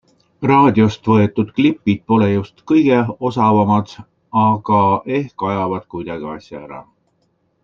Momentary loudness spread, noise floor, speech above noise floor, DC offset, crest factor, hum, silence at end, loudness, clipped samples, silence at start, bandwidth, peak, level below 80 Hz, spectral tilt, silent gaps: 15 LU; -64 dBFS; 48 dB; under 0.1%; 14 dB; none; 0.8 s; -16 LUFS; under 0.1%; 0.4 s; 7 kHz; -2 dBFS; -56 dBFS; -8.5 dB/octave; none